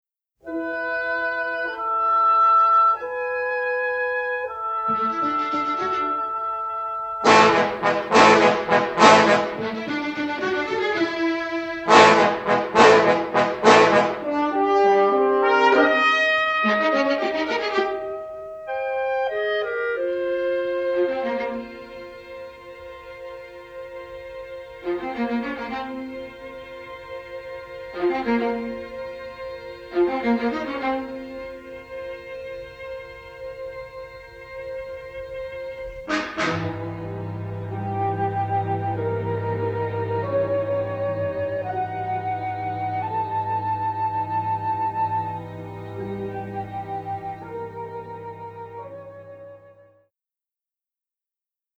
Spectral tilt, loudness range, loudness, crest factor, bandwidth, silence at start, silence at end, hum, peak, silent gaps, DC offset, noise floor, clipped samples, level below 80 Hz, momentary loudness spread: -5 dB/octave; 17 LU; -21 LUFS; 22 dB; 9 kHz; 0.45 s; 2.1 s; none; 0 dBFS; none; under 0.1%; under -90 dBFS; under 0.1%; -56 dBFS; 21 LU